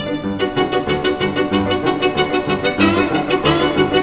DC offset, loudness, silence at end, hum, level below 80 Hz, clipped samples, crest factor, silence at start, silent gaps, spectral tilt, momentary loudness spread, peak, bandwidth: 0.2%; -17 LUFS; 0 s; none; -40 dBFS; under 0.1%; 14 dB; 0 s; none; -10 dB/octave; 4 LU; -2 dBFS; 4 kHz